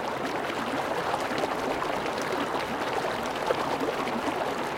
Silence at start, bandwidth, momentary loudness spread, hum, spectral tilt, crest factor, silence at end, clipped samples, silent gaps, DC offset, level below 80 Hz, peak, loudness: 0 s; 17 kHz; 2 LU; none; -4 dB/octave; 18 dB; 0 s; under 0.1%; none; under 0.1%; -58 dBFS; -12 dBFS; -29 LUFS